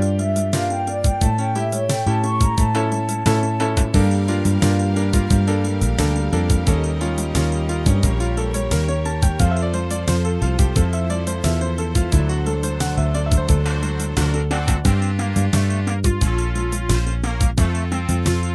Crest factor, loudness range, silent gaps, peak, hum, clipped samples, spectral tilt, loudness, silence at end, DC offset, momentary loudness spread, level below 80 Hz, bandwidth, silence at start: 16 dB; 2 LU; none; -2 dBFS; none; under 0.1%; -6 dB/octave; -20 LUFS; 0 s; under 0.1%; 4 LU; -24 dBFS; 11 kHz; 0 s